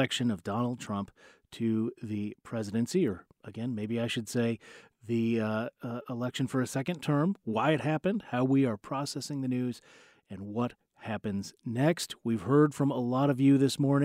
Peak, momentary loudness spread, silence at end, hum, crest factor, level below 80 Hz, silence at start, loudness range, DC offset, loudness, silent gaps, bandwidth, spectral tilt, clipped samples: -12 dBFS; 13 LU; 0 s; none; 18 dB; -70 dBFS; 0 s; 4 LU; under 0.1%; -31 LUFS; none; 15.5 kHz; -6.5 dB/octave; under 0.1%